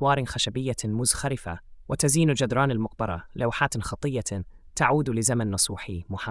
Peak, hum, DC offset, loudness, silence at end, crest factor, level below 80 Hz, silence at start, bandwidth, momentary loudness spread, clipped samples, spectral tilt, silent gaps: -6 dBFS; none; under 0.1%; -26 LUFS; 0 s; 20 dB; -46 dBFS; 0 s; 12 kHz; 12 LU; under 0.1%; -4 dB/octave; none